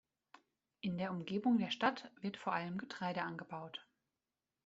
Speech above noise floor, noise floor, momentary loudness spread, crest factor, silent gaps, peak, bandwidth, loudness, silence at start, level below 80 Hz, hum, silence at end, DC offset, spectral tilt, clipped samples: over 51 dB; under -90 dBFS; 13 LU; 22 dB; none; -18 dBFS; 7.8 kHz; -40 LUFS; 0.85 s; -80 dBFS; none; 0.85 s; under 0.1%; -4 dB/octave; under 0.1%